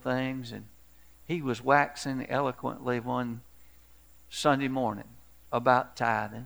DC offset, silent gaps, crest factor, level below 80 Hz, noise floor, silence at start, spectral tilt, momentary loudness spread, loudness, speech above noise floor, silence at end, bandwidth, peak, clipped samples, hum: 0.1%; none; 24 dB; -62 dBFS; -58 dBFS; 0.05 s; -5.5 dB/octave; 14 LU; -29 LUFS; 29 dB; 0 s; over 20 kHz; -8 dBFS; under 0.1%; none